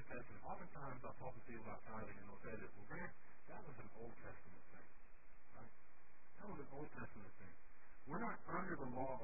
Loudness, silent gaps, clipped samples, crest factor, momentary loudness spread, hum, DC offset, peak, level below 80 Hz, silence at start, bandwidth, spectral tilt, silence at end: -53 LUFS; none; under 0.1%; 20 dB; 18 LU; none; 0.6%; -32 dBFS; -70 dBFS; 0 s; 2.7 kHz; -3 dB/octave; 0 s